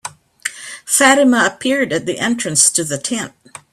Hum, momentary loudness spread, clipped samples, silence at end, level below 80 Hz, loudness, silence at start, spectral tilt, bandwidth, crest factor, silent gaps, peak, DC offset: none; 16 LU; under 0.1%; 0.45 s; -58 dBFS; -14 LUFS; 0.05 s; -2 dB/octave; 15.5 kHz; 16 dB; none; 0 dBFS; under 0.1%